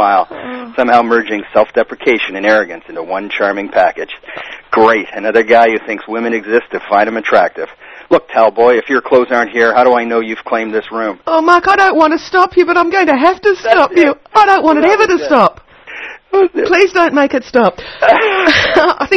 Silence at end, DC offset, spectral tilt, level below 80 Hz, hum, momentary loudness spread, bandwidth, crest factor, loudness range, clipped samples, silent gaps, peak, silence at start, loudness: 0 s; under 0.1%; -4.5 dB/octave; -48 dBFS; none; 11 LU; 9.2 kHz; 12 dB; 4 LU; 0.6%; none; 0 dBFS; 0 s; -11 LUFS